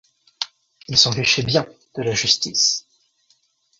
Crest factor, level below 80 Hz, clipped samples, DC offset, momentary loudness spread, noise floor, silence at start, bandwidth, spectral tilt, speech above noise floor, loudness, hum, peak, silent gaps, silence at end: 22 dB; -54 dBFS; under 0.1%; under 0.1%; 14 LU; -63 dBFS; 0.4 s; 7.8 kHz; -2 dB/octave; 44 dB; -18 LUFS; none; -2 dBFS; none; 1 s